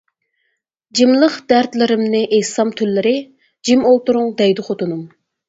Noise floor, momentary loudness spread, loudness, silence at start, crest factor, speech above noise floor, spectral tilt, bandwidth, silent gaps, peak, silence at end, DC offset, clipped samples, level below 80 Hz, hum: -70 dBFS; 10 LU; -15 LUFS; 0.95 s; 16 dB; 55 dB; -4.5 dB/octave; 8 kHz; none; 0 dBFS; 0.4 s; under 0.1%; under 0.1%; -62 dBFS; none